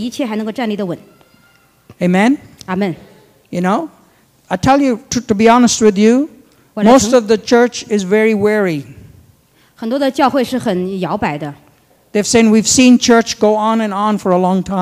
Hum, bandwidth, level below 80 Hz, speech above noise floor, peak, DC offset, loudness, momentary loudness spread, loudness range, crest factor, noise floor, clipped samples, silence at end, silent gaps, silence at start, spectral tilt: none; 15.5 kHz; -46 dBFS; 38 dB; 0 dBFS; under 0.1%; -13 LUFS; 14 LU; 7 LU; 14 dB; -51 dBFS; under 0.1%; 0 s; none; 0 s; -4.5 dB/octave